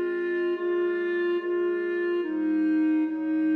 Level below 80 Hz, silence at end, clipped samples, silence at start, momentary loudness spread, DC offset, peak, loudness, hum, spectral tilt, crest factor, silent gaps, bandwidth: -76 dBFS; 0 s; under 0.1%; 0 s; 3 LU; under 0.1%; -18 dBFS; -26 LUFS; none; -7 dB/octave; 8 dB; none; 4.5 kHz